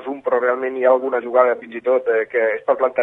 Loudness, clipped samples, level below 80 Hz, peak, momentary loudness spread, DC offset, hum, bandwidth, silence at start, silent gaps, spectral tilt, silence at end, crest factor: -18 LUFS; under 0.1%; -70 dBFS; -2 dBFS; 4 LU; under 0.1%; none; 3.8 kHz; 0 s; none; -7 dB/octave; 0 s; 16 dB